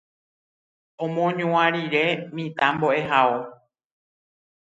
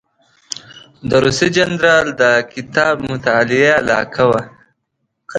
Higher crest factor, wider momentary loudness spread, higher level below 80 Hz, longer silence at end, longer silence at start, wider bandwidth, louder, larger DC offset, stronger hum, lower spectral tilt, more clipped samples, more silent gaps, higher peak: first, 22 dB vs 16 dB; second, 11 LU vs 16 LU; second, -68 dBFS vs -48 dBFS; first, 1.2 s vs 0 s; first, 1 s vs 0.75 s; second, 7.8 kHz vs 11 kHz; second, -22 LUFS vs -14 LUFS; neither; neither; first, -6.5 dB/octave vs -4.5 dB/octave; neither; neither; second, -4 dBFS vs 0 dBFS